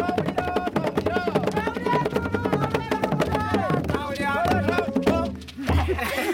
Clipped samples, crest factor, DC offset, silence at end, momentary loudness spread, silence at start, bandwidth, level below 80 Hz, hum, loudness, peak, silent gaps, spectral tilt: under 0.1%; 16 dB; under 0.1%; 0 s; 3 LU; 0 s; 17 kHz; -42 dBFS; none; -24 LUFS; -8 dBFS; none; -6.5 dB/octave